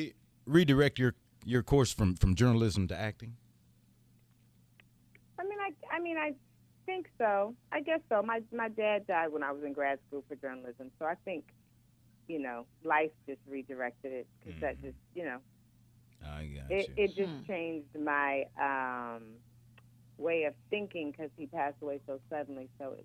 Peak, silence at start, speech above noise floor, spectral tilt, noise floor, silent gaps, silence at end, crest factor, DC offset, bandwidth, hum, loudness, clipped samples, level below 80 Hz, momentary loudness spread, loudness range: -12 dBFS; 0 s; 32 dB; -6 dB/octave; -65 dBFS; none; 0 s; 22 dB; under 0.1%; 15 kHz; none; -34 LUFS; under 0.1%; -50 dBFS; 17 LU; 9 LU